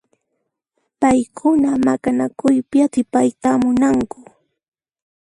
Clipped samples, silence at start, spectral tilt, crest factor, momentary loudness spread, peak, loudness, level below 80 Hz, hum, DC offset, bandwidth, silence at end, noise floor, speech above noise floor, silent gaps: under 0.1%; 1 s; -6 dB/octave; 16 dB; 4 LU; -2 dBFS; -17 LUFS; -52 dBFS; none; under 0.1%; 11.5 kHz; 1.35 s; -74 dBFS; 58 dB; none